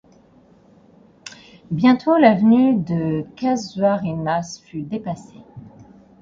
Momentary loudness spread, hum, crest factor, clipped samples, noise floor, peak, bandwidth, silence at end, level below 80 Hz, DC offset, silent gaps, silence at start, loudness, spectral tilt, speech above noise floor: 19 LU; none; 20 dB; under 0.1%; -52 dBFS; -2 dBFS; 7.6 kHz; 0.55 s; -56 dBFS; under 0.1%; none; 1.25 s; -18 LUFS; -7 dB/octave; 34 dB